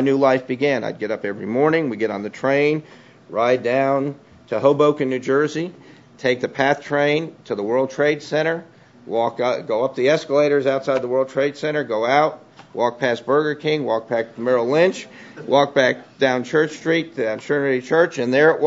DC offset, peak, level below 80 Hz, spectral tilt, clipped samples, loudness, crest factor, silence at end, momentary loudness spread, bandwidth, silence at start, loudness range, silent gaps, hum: under 0.1%; -2 dBFS; -68 dBFS; -5.5 dB/octave; under 0.1%; -20 LUFS; 18 dB; 0 s; 8 LU; 7.8 kHz; 0 s; 2 LU; none; none